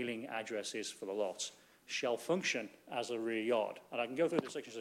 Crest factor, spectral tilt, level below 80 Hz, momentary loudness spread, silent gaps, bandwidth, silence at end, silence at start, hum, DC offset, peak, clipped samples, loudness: 20 dB; -3.5 dB/octave; -88 dBFS; 7 LU; none; 16 kHz; 0 s; 0 s; none; under 0.1%; -18 dBFS; under 0.1%; -38 LUFS